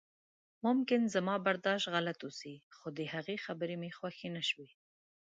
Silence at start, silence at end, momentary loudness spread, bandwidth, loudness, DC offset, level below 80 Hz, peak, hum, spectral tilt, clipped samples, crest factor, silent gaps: 0.65 s; 0.75 s; 14 LU; 9 kHz; -36 LUFS; under 0.1%; -84 dBFS; -18 dBFS; none; -5 dB/octave; under 0.1%; 18 dB; 2.63-2.71 s